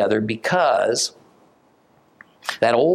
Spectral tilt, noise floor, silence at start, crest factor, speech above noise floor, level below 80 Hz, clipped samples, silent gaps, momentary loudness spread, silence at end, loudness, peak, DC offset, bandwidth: -3.5 dB/octave; -57 dBFS; 0 s; 18 dB; 39 dB; -68 dBFS; under 0.1%; none; 10 LU; 0 s; -20 LUFS; -4 dBFS; under 0.1%; 15 kHz